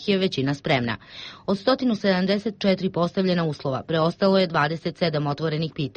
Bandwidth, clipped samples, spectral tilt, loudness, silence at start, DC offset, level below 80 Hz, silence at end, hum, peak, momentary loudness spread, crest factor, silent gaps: 8.4 kHz; under 0.1%; -7 dB/octave; -23 LUFS; 0 s; under 0.1%; -58 dBFS; 0.05 s; none; -8 dBFS; 7 LU; 16 dB; none